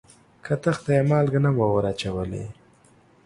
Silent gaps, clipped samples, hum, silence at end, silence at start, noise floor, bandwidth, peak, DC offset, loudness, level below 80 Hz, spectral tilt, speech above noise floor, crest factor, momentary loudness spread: none; under 0.1%; none; 0.75 s; 0.45 s; -56 dBFS; 11 kHz; -8 dBFS; under 0.1%; -23 LUFS; -48 dBFS; -7.5 dB/octave; 34 dB; 16 dB; 14 LU